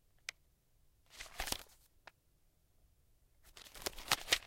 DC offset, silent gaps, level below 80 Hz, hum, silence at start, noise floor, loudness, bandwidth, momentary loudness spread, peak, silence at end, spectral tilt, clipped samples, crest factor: under 0.1%; none; -60 dBFS; none; 0.3 s; -73 dBFS; -41 LUFS; 17 kHz; 25 LU; -10 dBFS; 0 s; 0 dB/octave; under 0.1%; 34 dB